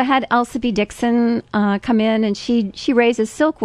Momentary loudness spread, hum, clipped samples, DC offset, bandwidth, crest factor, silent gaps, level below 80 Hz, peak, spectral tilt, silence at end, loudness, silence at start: 4 LU; none; under 0.1%; under 0.1%; 12 kHz; 16 dB; none; -48 dBFS; -2 dBFS; -5.5 dB/octave; 0 s; -18 LUFS; 0 s